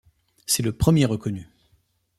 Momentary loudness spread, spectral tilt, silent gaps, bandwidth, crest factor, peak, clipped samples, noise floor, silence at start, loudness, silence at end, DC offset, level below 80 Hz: 16 LU; -5 dB/octave; none; 15.5 kHz; 20 dB; -4 dBFS; under 0.1%; -65 dBFS; 0.5 s; -22 LUFS; 0.75 s; under 0.1%; -44 dBFS